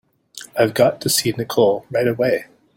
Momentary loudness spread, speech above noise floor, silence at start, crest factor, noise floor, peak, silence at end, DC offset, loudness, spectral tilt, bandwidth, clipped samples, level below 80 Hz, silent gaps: 8 LU; 23 dB; 0.35 s; 18 dB; -41 dBFS; -2 dBFS; 0.3 s; under 0.1%; -18 LUFS; -4 dB/octave; 17 kHz; under 0.1%; -58 dBFS; none